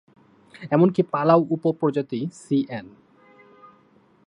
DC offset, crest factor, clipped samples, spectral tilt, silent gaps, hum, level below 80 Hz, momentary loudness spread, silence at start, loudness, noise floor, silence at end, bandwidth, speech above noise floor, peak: under 0.1%; 20 dB; under 0.1%; -8.5 dB/octave; none; none; -70 dBFS; 13 LU; 0.6 s; -22 LUFS; -58 dBFS; 1.4 s; 10.5 kHz; 36 dB; -4 dBFS